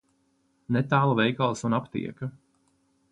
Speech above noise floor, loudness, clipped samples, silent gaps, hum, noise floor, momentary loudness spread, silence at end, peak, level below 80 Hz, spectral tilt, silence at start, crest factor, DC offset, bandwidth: 44 dB; -26 LUFS; under 0.1%; none; none; -69 dBFS; 13 LU; 0.8 s; -8 dBFS; -66 dBFS; -6.5 dB/octave; 0.7 s; 20 dB; under 0.1%; 10.5 kHz